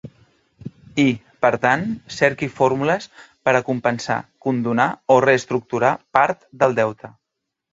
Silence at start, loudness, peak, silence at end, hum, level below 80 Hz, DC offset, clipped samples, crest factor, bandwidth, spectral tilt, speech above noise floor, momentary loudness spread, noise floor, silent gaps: 0.05 s; -20 LUFS; 0 dBFS; 0.65 s; none; -58 dBFS; under 0.1%; under 0.1%; 20 dB; 7.8 kHz; -6 dB/octave; 61 dB; 10 LU; -80 dBFS; none